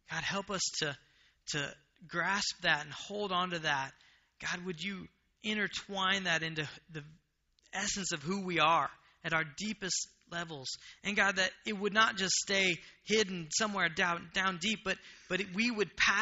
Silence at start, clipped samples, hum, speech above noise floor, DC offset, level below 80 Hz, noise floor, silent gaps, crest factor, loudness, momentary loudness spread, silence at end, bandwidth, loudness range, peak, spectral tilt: 0.1 s; under 0.1%; none; 38 dB; under 0.1%; -66 dBFS; -72 dBFS; none; 22 dB; -33 LUFS; 13 LU; 0 s; 8 kHz; 5 LU; -12 dBFS; -1.5 dB/octave